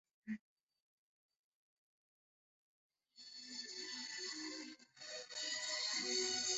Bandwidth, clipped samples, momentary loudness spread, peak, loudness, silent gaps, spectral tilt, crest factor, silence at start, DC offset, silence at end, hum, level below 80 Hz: 8.2 kHz; under 0.1%; 16 LU; -28 dBFS; -42 LUFS; 0.41-0.57 s, 0.63-0.67 s, 0.82-1.29 s, 1.39-2.90 s; 0 dB/octave; 20 dB; 0.25 s; under 0.1%; 0 s; none; under -90 dBFS